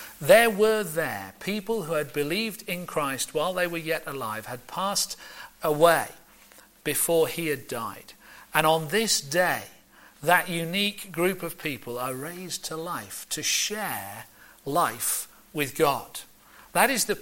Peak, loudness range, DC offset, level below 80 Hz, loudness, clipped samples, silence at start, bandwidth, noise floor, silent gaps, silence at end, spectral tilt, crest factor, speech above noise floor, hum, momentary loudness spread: -6 dBFS; 4 LU; under 0.1%; -60 dBFS; -26 LUFS; under 0.1%; 0 s; 17 kHz; -54 dBFS; none; 0 s; -3 dB/octave; 22 dB; 27 dB; none; 13 LU